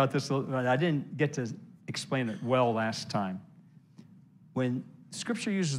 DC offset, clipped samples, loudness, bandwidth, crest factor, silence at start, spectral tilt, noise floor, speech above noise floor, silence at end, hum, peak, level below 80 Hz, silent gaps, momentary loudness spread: under 0.1%; under 0.1%; -31 LUFS; 12.5 kHz; 20 dB; 0 s; -5.5 dB/octave; -57 dBFS; 27 dB; 0 s; none; -12 dBFS; -78 dBFS; none; 12 LU